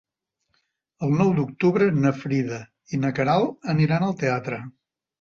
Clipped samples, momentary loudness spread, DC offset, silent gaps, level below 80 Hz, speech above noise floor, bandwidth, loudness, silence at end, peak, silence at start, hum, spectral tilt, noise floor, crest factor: under 0.1%; 11 LU; under 0.1%; none; -60 dBFS; 56 dB; 7.2 kHz; -23 LUFS; 0.5 s; -8 dBFS; 1 s; none; -8 dB/octave; -79 dBFS; 16 dB